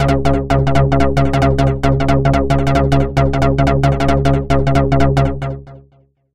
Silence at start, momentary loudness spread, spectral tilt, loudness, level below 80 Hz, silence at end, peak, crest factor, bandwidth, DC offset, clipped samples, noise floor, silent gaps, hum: 0 s; 2 LU; -7.5 dB/octave; -14 LUFS; -22 dBFS; 0 s; -2 dBFS; 12 dB; 10 kHz; under 0.1%; under 0.1%; -52 dBFS; none; none